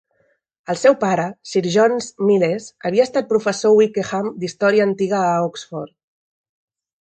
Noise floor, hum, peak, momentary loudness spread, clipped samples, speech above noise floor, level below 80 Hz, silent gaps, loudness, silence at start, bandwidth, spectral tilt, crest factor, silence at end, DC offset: -64 dBFS; none; -2 dBFS; 11 LU; under 0.1%; 46 dB; -64 dBFS; none; -18 LUFS; 0.7 s; 9.2 kHz; -5.5 dB/octave; 18 dB; 1.15 s; under 0.1%